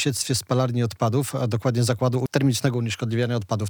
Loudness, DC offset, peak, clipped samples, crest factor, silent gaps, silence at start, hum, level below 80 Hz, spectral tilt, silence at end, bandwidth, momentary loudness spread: -23 LUFS; under 0.1%; -6 dBFS; under 0.1%; 16 dB; none; 0 s; none; -60 dBFS; -5.5 dB/octave; 0 s; 19.5 kHz; 3 LU